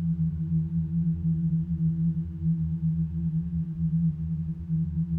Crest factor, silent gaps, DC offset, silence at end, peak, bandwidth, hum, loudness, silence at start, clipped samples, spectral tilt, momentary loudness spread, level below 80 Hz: 10 dB; none; under 0.1%; 0 s; -18 dBFS; 1 kHz; none; -28 LUFS; 0 s; under 0.1%; -13 dB/octave; 4 LU; -42 dBFS